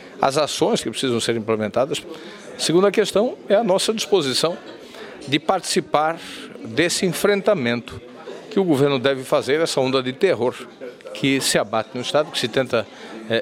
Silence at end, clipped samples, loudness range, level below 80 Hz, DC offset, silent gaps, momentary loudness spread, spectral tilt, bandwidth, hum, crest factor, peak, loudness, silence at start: 0 s; under 0.1%; 2 LU; -60 dBFS; under 0.1%; none; 18 LU; -4 dB/octave; 16 kHz; none; 20 dB; 0 dBFS; -20 LUFS; 0 s